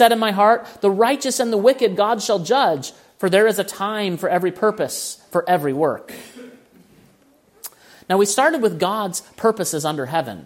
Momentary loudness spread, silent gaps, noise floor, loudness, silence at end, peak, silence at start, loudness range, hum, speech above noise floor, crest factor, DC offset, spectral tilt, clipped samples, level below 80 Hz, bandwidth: 11 LU; none; -55 dBFS; -19 LUFS; 0 s; 0 dBFS; 0 s; 6 LU; none; 37 dB; 18 dB; under 0.1%; -4 dB/octave; under 0.1%; -68 dBFS; 16.5 kHz